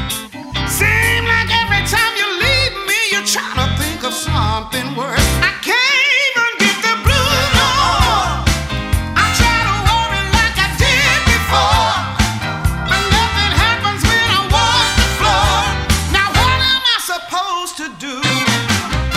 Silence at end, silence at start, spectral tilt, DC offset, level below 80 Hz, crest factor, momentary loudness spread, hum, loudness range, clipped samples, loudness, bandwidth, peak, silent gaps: 0 s; 0 s; -3 dB/octave; under 0.1%; -24 dBFS; 14 dB; 7 LU; none; 2 LU; under 0.1%; -14 LUFS; 16 kHz; 0 dBFS; none